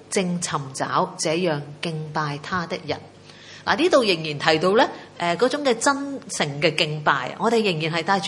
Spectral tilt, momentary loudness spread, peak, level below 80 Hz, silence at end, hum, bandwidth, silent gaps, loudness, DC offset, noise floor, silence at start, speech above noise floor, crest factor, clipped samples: -4 dB/octave; 10 LU; 0 dBFS; -64 dBFS; 0 s; none; 11.5 kHz; none; -22 LUFS; under 0.1%; -44 dBFS; 0 s; 21 dB; 22 dB; under 0.1%